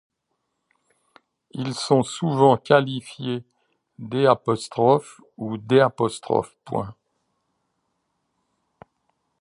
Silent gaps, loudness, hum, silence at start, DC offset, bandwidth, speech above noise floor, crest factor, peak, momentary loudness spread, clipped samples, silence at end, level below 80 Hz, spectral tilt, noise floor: none; -22 LUFS; none; 1.55 s; under 0.1%; 11.5 kHz; 56 dB; 22 dB; -2 dBFS; 14 LU; under 0.1%; 2.5 s; -64 dBFS; -6 dB/octave; -77 dBFS